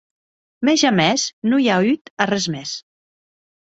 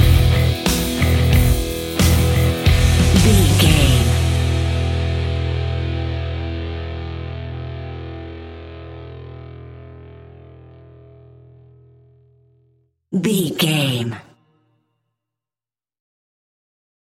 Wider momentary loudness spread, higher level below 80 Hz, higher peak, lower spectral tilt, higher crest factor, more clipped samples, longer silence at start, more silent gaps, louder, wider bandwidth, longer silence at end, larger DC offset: second, 11 LU vs 22 LU; second, -60 dBFS vs -26 dBFS; about the same, -2 dBFS vs 0 dBFS; about the same, -4 dB/octave vs -5 dB/octave; about the same, 18 dB vs 18 dB; neither; first, 0.6 s vs 0 s; first, 1.33-1.42 s, 2.01-2.05 s, 2.11-2.17 s vs none; about the same, -18 LUFS vs -18 LUFS; second, 8 kHz vs 17 kHz; second, 0.95 s vs 2.85 s; neither